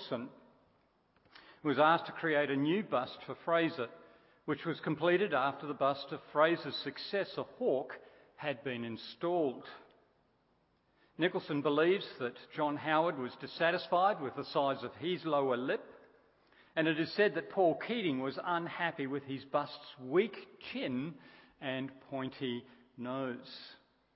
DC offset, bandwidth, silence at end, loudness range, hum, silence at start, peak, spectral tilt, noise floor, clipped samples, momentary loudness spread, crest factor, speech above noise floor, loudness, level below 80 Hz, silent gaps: under 0.1%; 5.6 kHz; 0.4 s; 6 LU; none; 0 s; -14 dBFS; -3.5 dB/octave; -74 dBFS; under 0.1%; 13 LU; 22 dB; 39 dB; -35 LUFS; -80 dBFS; none